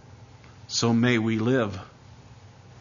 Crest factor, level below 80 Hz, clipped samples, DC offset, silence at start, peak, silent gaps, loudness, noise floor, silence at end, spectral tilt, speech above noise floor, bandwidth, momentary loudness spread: 18 dB; -60 dBFS; under 0.1%; under 0.1%; 0.2 s; -8 dBFS; none; -24 LUFS; -49 dBFS; 0.35 s; -5 dB/octave; 26 dB; 7.4 kHz; 9 LU